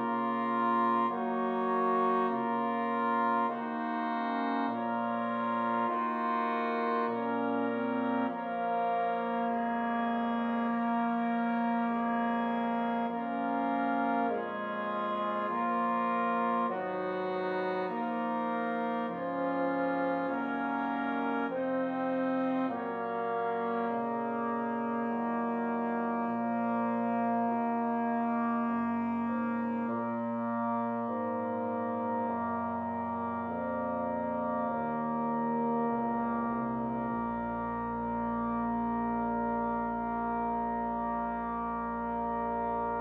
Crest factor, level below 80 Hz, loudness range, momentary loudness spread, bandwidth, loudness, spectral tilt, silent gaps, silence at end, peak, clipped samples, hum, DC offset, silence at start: 14 dB; -62 dBFS; 2 LU; 4 LU; 4.7 kHz; -32 LUFS; -8.5 dB/octave; none; 0 s; -18 dBFS; under 0.1%; none; under 0.1%; 0 s